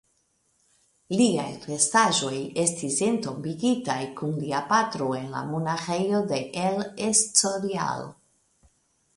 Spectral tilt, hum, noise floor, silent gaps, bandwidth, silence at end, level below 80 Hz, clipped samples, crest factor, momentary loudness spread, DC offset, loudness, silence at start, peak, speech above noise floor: -3.5 dB/octave; none; -70 dBFS; none; 11.5 kHz; 1.05 s; -66 dBFS; under 0.1%; 22 dB; 10 LU; under 0.1%; -25 LUFS; 1.1 s; -6 dBFS; 44 dB